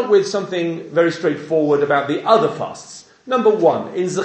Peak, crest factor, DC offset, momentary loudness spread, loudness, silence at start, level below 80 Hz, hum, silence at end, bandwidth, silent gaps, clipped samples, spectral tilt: 0 dBFS; 18 dB; under 0.1%; 13 LU; -18 LUFS; 0 s; -68 dBFS; none; 0 s; 9 kHz; none; under 0.1%; -5.5 dB/octave